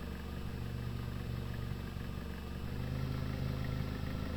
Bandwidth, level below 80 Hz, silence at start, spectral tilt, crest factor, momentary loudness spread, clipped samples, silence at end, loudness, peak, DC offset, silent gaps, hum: over 20 kHz; -44 dBFS; 0 s; -7 dB/octave; 14 dB; 5 LU; under 0.1%; 0 s; -41 LUFS; -26 dBFS; under 0.1%; none; none